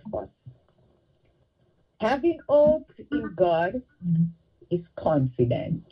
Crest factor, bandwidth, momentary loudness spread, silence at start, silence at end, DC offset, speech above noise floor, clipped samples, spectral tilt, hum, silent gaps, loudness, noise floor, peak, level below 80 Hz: 18 dB; 6.2 kHz; 12 LU; 0.05 s; 0.1 s; under 0.1%; 42 dB; under 0.1%; -9.5 dB/octave; none; none; -25 LUFS; -66 dBFS; -8 dBFS; -54 dBFS